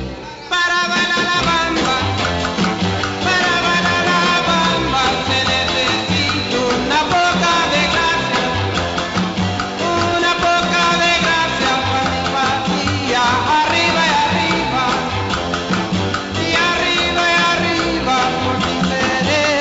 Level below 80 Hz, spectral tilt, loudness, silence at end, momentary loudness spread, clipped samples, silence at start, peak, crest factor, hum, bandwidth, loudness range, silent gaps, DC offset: -38 dBFS; -3.5 dB/octave; -15 LUFS; 0 s; 5 LU; under 0.1%; 0 s; -4 dBFS; 12 dB; none; 8 kHz; 1 LU; none; under 0.1%